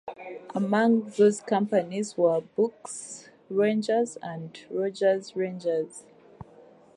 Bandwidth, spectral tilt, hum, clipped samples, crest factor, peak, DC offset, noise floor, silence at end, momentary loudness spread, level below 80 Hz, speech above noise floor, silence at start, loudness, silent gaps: 11.5 kHz; -5.5 dB/octave; none; under 0.1%; 16 dB; -10 dBFS; under 0.1%; -53 dBFS; 0.55 s; 16 LU; -72 dBFS; 27 dB; 0.05 s; -26 LUFS; none